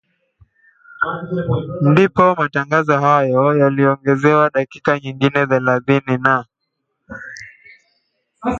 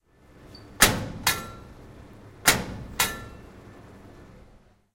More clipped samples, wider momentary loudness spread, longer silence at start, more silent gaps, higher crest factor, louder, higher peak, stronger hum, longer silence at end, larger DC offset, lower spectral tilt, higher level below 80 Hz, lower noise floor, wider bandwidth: neither; second, 11 LU vs 25 LU; first, 1 s vs 0.4 s; neither; second, 16 dB vs 28 dB; first, -16 LUFS vs -24 LUFS; about the same, 0 dBFS vs -2 dBFS; neither; second, 0 s vs 0.55 s; neither; first, -7.5 dB/octave vs -1.5 dB/octave; second, -50 dBFS vs -44 dBFS; first, -74 dBFS vs -56 dBFS; second, 7.6 kHz vs 16 kHz